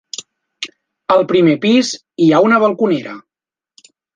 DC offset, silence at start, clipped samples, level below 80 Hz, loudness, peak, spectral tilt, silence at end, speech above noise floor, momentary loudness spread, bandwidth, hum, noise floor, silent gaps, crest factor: under 0.1%; 0.2 s; under 0.1%; -62 dBFS; -13 LUFS; -2 dBFS; -5.5 dB/octave; 0.95 s; 77 dB; 19 LU; 9.6 kHz; none; -89 dBFS; none; 14 dB